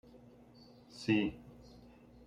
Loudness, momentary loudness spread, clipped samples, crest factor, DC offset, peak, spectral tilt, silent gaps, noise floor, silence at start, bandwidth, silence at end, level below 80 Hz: -35 LUFS; 26 LU; under 0.1%; 22 dB; under 0.1%; -18 dBFS; -6 dB/octave; none; -59 dBFS; 0.95 s; 10.5 kHz; 0.75 s; -64 dBFS